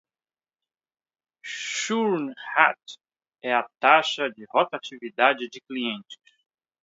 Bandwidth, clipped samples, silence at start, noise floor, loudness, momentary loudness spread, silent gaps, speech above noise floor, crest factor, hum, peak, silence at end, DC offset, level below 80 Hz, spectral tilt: 8 kHz; under 0.1%; 1.45 s; under -90 dBFS; -24 LUFS; 17 LU; none; over 66 dB; 24 dB; none; -2 dBFS; 0.7 s; under 0.1%; -84 dBFS; -2.5 dB/octave